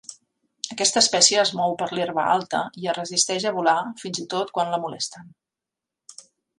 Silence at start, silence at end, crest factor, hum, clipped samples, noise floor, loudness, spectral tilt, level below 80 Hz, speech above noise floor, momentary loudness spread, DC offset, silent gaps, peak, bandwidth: 0.1 s; 0.45 s; 24 dB; none; under 0.1%; -87 dBFS; -22 LUFS; -1.5 dB/octave; -72 dBFS; 64 dB; 15 LU; under 0.1%; none; -2 dBFS; 11.5 kHz